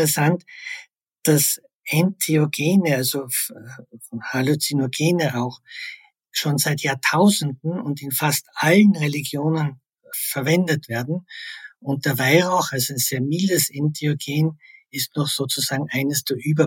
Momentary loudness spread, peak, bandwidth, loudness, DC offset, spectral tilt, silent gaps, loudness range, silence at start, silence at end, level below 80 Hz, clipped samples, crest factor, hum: 16 LU; -2 dBFS; 17 kHz; -21 LUFS; under 0.1%; -4.5 dB/octave; 1.75-1.80 s; 4 LU; 0 s; 0 s; -70 dBFS; under 0.1%; 20 dB; none